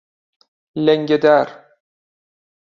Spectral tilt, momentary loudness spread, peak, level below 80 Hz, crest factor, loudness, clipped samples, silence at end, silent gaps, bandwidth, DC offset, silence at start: -7 dB/octave; 14 LU; -2 dBFS; -66 dBFS; 18 dB; -16 LUFS; under 0.1%; 1.2 s; none; 6.8 kHz; under 0.1%; 0.75 s